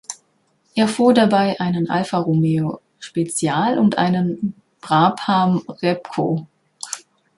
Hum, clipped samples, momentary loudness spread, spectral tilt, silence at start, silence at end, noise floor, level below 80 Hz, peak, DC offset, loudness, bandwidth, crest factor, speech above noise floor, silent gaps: none; under 0.1%; 15 LU; -6 dB/octave; 0.1 s; 0.4 s; -63 dBFS; -60 dBFS; -2 dBFS; under 0.1%; -19 LUFS; 11.5 kHz; 16 dB; 45 dB; none